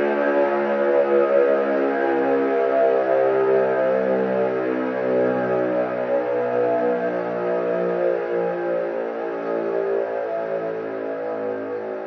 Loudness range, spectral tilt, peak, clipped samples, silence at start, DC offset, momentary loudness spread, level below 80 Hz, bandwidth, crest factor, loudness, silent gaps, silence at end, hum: 6 LU; -8.5 dB/octave; -6 dBFS; under 0.1%; 0 s; under 0.1%; 8 LU; -70 dBFS; 6.2 kHz; 14 dB; -21 LUFS; none; 0 s; none